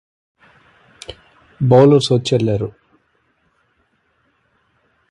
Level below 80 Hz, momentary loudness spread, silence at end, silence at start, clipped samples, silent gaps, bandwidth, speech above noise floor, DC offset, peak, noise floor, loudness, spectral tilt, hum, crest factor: -50 dBFS; 26 LU; 2.4 s; 1.1 s; under 0.1%; none; 11 kHz; 50 dB; under 0.1%; 0 dBFS; -63 dBFS; -14 LUFS; -7 dB/octave; none; 18 dB